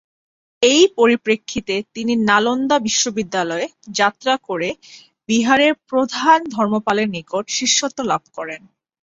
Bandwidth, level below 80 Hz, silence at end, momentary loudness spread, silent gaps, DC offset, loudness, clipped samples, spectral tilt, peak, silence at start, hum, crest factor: 8 kHz; -58 dBFS; 0.45 s; 11 LU; none; under 0.1%; -17 LUFS; under 0.1%; -2.5 dB/octave; -2 dBFS; 0.6 s; none; 18 dB